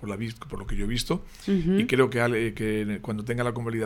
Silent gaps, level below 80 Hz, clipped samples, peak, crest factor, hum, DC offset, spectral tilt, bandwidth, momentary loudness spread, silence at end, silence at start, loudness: none; -38 dBFS; under 0.1%; -8 dBFS; 18 dB; none; under 0.1%; -6 dB/octave; 17 kHz; 11 LU; 0 s; 0 s; -27 LUFS